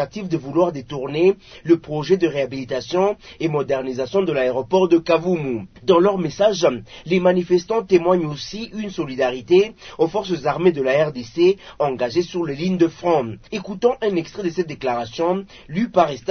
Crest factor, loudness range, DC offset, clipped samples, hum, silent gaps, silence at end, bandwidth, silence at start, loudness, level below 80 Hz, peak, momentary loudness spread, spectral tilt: 18 dB; 3 LU; under 0.1%; under 0.1%; none; none; 0 s; 6.6 kHz; 0 s; -20 LUFS; -52 dBFS; -2 dBFS; 10 LU; -6.5 dB/octave